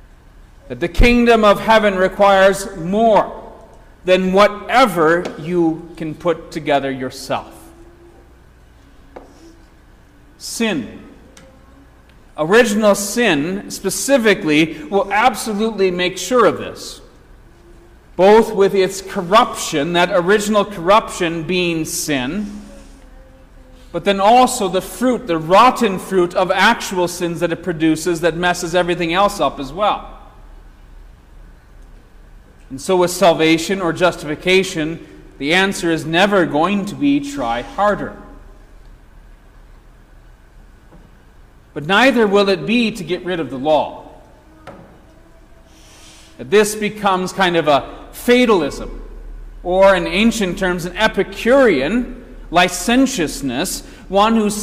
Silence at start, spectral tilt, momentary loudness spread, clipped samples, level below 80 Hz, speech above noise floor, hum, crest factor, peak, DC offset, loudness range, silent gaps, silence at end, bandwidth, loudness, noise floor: 0.65 s; -4 dB/octave; 13 LU; under 0.1%; -36 dBFS; 30 dB; none; 16 dB; -2 dBFS; under 0.1%; 10 LU; none; 0 s; 16 kHz; -16 LUFS; -46 dBFS